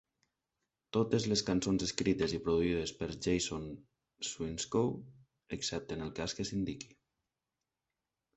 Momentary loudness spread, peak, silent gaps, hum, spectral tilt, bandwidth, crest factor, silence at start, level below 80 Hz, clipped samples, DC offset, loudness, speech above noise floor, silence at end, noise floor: 12 LU; -12 dBFS; none; none; -4.5 dB/octave; 8.4 kHz; 24 dB; 0.95 s; -56 dBFS; under 0.1%; under 0.1%; -35 LUFS; 55 dB; 1.5 s; -90 dBFS